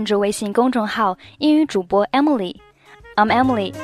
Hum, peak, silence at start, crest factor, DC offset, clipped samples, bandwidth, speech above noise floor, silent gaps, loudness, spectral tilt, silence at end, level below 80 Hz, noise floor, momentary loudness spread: none; -2 dBFS; 0 s; 16 dB; under 0.1%; under 0.1%; 14 kHz; 27 dB; none; -18 LUFS; -5 dB/octave; 0 s; -52 dBFS; -45 dBFS; 6 LU